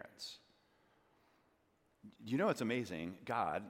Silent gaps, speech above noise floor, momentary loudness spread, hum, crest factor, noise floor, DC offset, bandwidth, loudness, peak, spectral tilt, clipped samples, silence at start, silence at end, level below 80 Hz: none; 38 dB; 16 LU; none; 20 dB; -76 dBFS; under 0.1%; 16.5 kHz; -39 LUFS; -22 dBFS; -5.5 dB/octave; under 0.1%; 0 s; 0 s; -80 dBFS